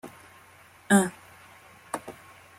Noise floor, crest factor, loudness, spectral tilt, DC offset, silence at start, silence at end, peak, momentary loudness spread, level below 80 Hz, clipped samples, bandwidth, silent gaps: -54 dBFS; 24 dB; -26 LUFS; -4.5 dB/octave; under 0.1%; 0.05 s; 0.5 s; -6 dBFS; 26 LU; -70 dBFS; under 0.1%; 16 kHz; none